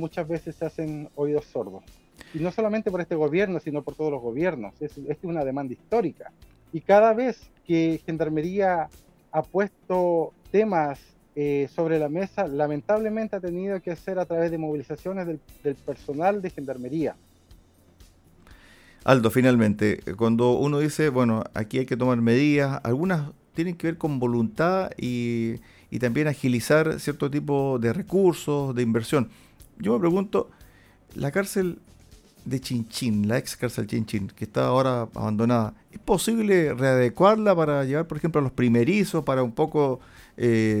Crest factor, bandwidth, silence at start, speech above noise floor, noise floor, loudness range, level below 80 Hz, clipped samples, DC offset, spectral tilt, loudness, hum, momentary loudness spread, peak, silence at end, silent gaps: 22 dB; 16.5 kHz; 0 s; 30 dB; -54 dBFS; 7 LU; -54 dBFS; under 0.1%; under 0.1%; -6.5 dB/octave; -25 LUFS; none; 11 LU; -2 dBFS; 0 s; none